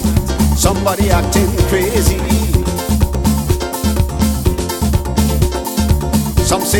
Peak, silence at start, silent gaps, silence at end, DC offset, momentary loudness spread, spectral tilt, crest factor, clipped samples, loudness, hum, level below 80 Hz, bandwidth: 0 dBFS; 0 s; none; 0 s; under 0.1%; 4 LU; -5 dB/octave; 14 dB; under 0.1%; -15 LUFS; none; -18 dBFS; 18.5 kHz